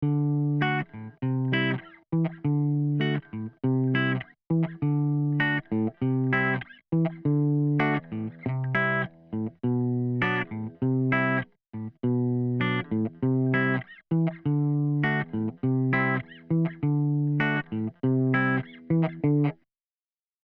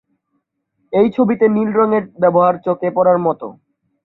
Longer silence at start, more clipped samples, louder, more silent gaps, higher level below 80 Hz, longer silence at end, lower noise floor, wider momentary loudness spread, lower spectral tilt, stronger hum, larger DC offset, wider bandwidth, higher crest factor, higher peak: second, 0 s vs 0.9 s; neither; second, -27 LUFS vs -15 LUFS; neither; about the same, -64 dBFS vs -60 dBFS; first, 0.9 s vs 0.55 s; first, under -90 dBFS vs -70 dBFS; about the same, 7 LU vs 7 LU; about the same, -10 dB/octave vs -11 dB/octave; neither; neither; first, 4.9 kHz vs 4.1 kHz; about the same, 14 dB vs 14 dB; second, -12 dBFS vs -2 dBFS